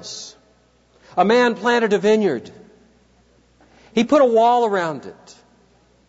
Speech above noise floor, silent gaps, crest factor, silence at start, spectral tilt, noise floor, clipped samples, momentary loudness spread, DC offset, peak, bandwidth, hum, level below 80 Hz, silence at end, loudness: 40 dB; none; 16 dB; 0 s; -5 dB/octave; -57 dBFS; under 0.1%; 19 LU; under 0.1%; -4 dBFS; 8 kHz; 60 Hz at -60 dBFS; -64 dBFS; 0.95 s; -17 LUFS